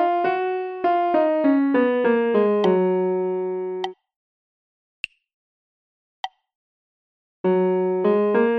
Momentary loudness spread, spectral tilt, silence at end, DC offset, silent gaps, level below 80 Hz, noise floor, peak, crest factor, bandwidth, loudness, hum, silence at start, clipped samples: 15 LU; -8 dB/octave; 0 s; under 0.1%; 4.16-5.04 s, 5.34-6.24 s, 6.55-7.44 s; -72 dBFS; under -90 dBFS; -8 dBFS; 14 dB; 6.2 kHz; -21 LUFS; none; 0 s; under 0.1%